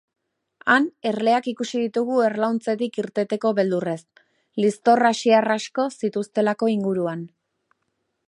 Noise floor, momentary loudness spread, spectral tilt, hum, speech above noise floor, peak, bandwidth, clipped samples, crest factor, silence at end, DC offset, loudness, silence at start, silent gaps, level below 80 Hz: -75 dBFS; 9 LU; -5 dB/octave; none; 53 dB; -4 dBFS; 11 kHz; under 0.1%; 18 dB; 1 s; under 0.1%; -22 LUFS; 0.65 s; none; -76 dBFS